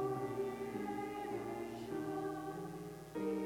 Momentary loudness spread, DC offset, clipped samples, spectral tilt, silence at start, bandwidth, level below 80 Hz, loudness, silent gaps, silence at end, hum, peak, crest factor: 6 LU; under 0.1%; under 0.1%; -6.5 dB/octave; 0 s; 19 kHz; -68 dBFS; -43 LUFS; none; 0 s; none; -28 dBFS; 14 dB